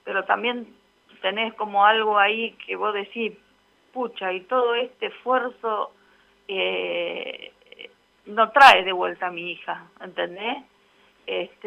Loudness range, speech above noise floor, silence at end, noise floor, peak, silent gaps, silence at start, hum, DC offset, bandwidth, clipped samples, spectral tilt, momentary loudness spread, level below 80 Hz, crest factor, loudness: 7 LU; 39 dB; 0.2 s; -61 dBFS; -2 dBFS; none; 0.05 s; none; under 0.1%; 15 kHz; under 0.1%; -3 dB/octave; 16 LU; -68 dBFS; 22 dB; -22 LUFS